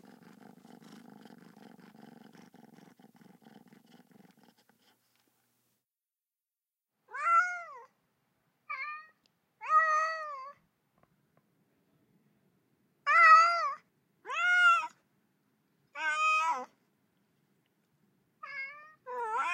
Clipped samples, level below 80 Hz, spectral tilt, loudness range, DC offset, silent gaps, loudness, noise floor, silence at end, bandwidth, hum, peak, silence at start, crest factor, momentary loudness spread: under 0.1%; under -90 dBFS; -1 dB/octave; 10 LU; under 0.1%; none; -27 LUFS; under -90 dBFS; 0 s; 10.5 kHz; none; -10 dBFS; 0.9 s; 24 dB; 25 LU